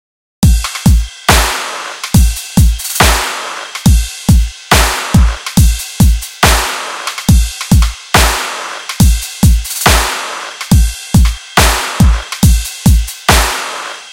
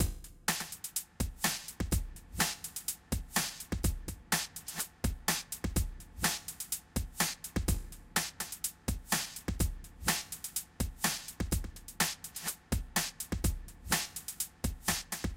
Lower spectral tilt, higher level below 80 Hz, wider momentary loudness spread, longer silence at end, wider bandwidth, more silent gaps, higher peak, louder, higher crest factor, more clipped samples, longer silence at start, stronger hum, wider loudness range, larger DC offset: first, -4 dB/octave vs -2.5 dB/octave; first, -14 dBFS vs -42 dBFS; first, 9 LU vs 6 LU; about the same, 0 s vs 0 s; about the same, 17 kHz vs 17 kHz; neither; first, 0 dBFS vs -14 dBFS; first, -12 LUFS vs -35 LUFS; second, 10 dB vs 22 dB; first, 0.6% vs under 0.1%; first, 0.4 s vs 0 s; neither; about the same, 1 LU vs 1 LU; neither